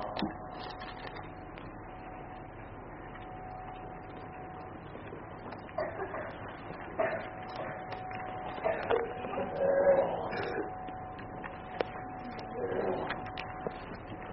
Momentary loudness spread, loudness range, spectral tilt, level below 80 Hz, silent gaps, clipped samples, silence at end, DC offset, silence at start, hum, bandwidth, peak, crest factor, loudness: 13 LU; 13 LU; -4.5 dB/octave; -56 dBFS; none; under 0.1%; 0 s; under 0.1%; 0 s; none; 5.8 kHz; -12 dBFS; 26 dB; -37 LUFS